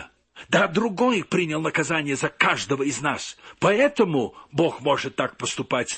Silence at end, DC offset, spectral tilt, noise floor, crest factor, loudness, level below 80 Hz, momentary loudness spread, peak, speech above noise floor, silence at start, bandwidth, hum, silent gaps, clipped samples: 0 s; under 0.1%; -4.5 dB/octave; -46 dBFS; 20 dB; -23 LUFS; -60 dBFS; 7 LU; -2 dBFS; 23 dB; 0 s; 8.8 kHz; none; none; under 0.1%